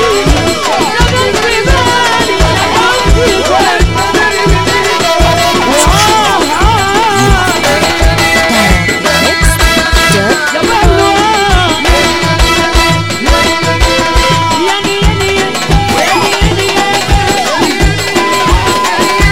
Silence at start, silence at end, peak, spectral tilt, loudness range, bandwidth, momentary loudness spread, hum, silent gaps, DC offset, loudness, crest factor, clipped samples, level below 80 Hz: 0 s; 0 s; 0 dBFS; -3.5 dB/octave; 2 LU; 17 kHz; 3 LU; none; none; 4%; -8 LUFS; 8 dB; 0.3%; -16 dBFS